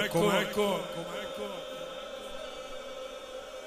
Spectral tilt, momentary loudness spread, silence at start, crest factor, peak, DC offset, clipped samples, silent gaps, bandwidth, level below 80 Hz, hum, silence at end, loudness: -4 dB/octave; 14 LU; 0 s; 20 dB; -12 dBFS; under 0.1%; under 0.1%; none; 15.5 kHz; -58 dBFS; none; 0 s; -34 LUFS